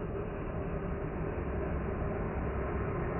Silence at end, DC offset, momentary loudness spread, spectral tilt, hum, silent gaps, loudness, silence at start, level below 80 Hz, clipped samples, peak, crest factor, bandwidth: 0 s; under 0.1%; 3 LU; -5.5 dB/octave; none; none; -36 LUFS; 0 s; -40 dBFS; under 0.1%; -22 dBFS; 12 dB; 3 kHz